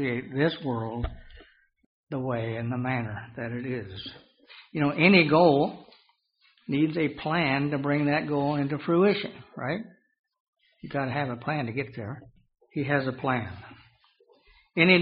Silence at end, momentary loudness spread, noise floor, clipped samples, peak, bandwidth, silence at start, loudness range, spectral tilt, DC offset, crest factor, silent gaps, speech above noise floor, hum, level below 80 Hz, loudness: 0 s; 18 LU; -66 dBFS; under 0.1%; -4 dBFS; 5.2 kHz; 0 s; 9 LU; -4.5 dB/octave; under 0.1%; 24 dB; 1.86-2.07 s, 10.19-10.24 s, 10.40-10.53 s; 40 dB; none; -54 dBFS; -27 LUFS